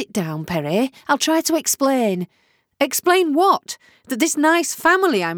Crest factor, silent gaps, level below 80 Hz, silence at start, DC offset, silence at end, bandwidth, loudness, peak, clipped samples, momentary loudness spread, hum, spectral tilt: 16 dB; none; -60 dBFS; 0 s; under 0.1%; 0 s; over 20 kHz; -18 LUFS; -4 dBFS; under 0.1%; 10 LU; none; -3.5 dB/octave